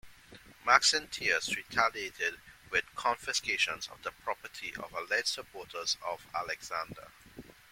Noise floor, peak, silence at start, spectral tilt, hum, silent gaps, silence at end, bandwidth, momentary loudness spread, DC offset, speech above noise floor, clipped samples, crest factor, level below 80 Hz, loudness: -55 dBFS; -8 dBFS; 0.05 s; 0 dB/octave; none; none; 0.2 s; 16.5 kHz; 14 LU; under 0.1%; 22 dB; under 0.1%; 26 dB; -66 dBFS; -32 LUFS